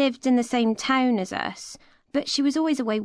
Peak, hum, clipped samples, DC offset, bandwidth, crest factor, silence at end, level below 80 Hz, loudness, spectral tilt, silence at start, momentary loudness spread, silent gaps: -10 dBFS; none; under 0.1%; under 0.1%; 11 kHz; 14 dB; 0 s; -64 dBFS; -24 LUFS; -4 dB/octave; 0 s; 10 LU; none